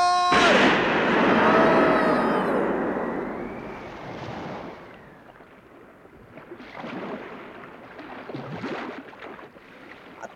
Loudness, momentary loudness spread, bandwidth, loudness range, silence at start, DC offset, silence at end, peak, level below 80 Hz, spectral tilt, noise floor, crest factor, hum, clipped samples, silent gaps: -21 LUFS; 24 LU; 13.5 kHz; 20 LU; 0 s; under 0.1%; 0 s; -8 dBFS; -54 dBFS; -5 dB/octave; -49 dBFS; 18 dB; none; under 0.1%; none